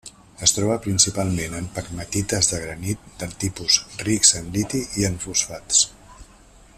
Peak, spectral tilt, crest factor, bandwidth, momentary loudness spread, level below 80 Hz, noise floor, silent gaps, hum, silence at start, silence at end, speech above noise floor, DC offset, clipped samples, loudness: 0 dBFS; -2.5 dB/octave; 24 dB; 14.5 kHz; 13 LU; -46 dBFS; -49 dBFS; none; none; 0.05 s; 0.55 s; 27 dB; under 0.1%; under 0.1%; -21 LUFS